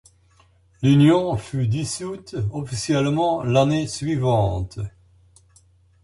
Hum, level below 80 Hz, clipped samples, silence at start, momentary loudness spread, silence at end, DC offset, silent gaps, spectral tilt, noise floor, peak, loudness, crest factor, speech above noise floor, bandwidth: none; -44 dBFS; under 0.1%; 0.8 s; 13 LU; 1.15 s; under 0.1%; none; -6.5 dB/octave; -57 dBFS; -4 dBFS; -21 LUFS; 18 dB; 37 dB; 11.5 kHz